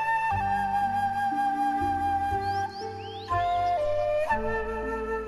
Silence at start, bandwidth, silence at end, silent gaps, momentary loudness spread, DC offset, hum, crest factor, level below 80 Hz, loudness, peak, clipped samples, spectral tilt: 0 s; 14.5 kHz; 0 s; none; 5 LU; under 0.1%; none; 12 dB; -46 dBFS; -28 LUFS; -16 dBFS; under 0.1%; -6 dB/octave